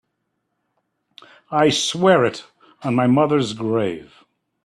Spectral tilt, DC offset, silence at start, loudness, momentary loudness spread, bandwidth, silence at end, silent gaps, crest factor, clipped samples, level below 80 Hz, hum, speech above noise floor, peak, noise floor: -5 dB/octave; under 0.1%; 1.5 s; -18 LUFS; 12 LU; 13 kHz; 0.6 s; none; 20 dB; under 0.1%; -60 dBFS; none; 56 dB; -2 dBFS; -74 dBFS